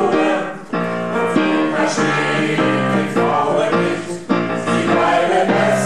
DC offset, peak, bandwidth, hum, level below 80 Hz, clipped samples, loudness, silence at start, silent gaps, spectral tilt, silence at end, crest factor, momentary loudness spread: 0.9%; -4 dBFS; 12.5 kHz; none; -56 dBFS; under 0.1%; -17 LUFS; 0 s; none; -5.5 dB/octave; 0 s; 14 dB; 6 LU